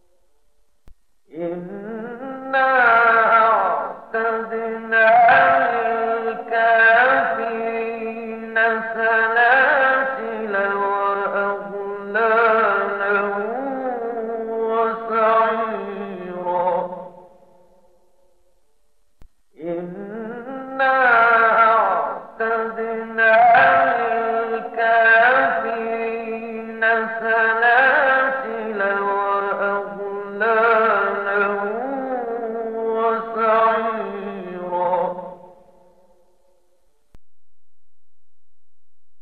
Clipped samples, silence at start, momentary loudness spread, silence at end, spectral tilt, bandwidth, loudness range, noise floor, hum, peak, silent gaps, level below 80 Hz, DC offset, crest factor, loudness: under 0.1%; 0.85 s; 16 LU; 0 s; -7 dB/octave; 5 kHz; 12 LU; -86 dBFS; none; -6 dBFS; none; -62 dBFS; 0.1%; 14 dB; -18 LUFS